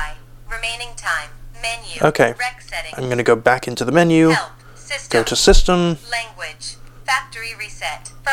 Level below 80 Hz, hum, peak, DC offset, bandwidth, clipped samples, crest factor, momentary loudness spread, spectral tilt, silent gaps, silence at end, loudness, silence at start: -26 dBFS; none; 0 dBFS; under 0.1%; 17 kHz; under 0.1%; 18 dB; 16 LU; -4 dB/octave; none; 0 s; -18 LUFS; 0 s